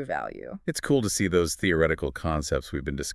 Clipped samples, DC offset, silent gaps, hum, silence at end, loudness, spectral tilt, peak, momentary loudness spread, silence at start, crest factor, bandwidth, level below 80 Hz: under 0.1%; under 0.1%; none; none; 0 s; -26 LUFS; -4.5 dB/octave; -10 dBFS; 9 LU; 0 s; 18 dB; 12 kHz; -42 dBFS